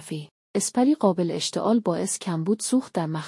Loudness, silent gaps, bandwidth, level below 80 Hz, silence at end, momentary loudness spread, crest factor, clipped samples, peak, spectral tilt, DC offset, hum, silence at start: -24 LUFS; 0.31-0.54 s; 12 kHz; -74 dBFS; 0 s; 8 LU; 16 dB; under 0.1%; -8 dBFS; -5 dB/octave; under 0.1%; none; 0 s